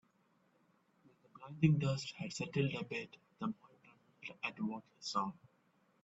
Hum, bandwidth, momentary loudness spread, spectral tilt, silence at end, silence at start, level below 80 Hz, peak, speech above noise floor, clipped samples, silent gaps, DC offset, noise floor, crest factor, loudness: none; 8 kHz; 19 LU; -6 dB/octave; 0.7 s; 1.35 s; -74 dBFS; -18 dBFS; 36 dB; under 0.1%; none; under 0.1%; -75 dBFS; 24 dB; -39 LUFS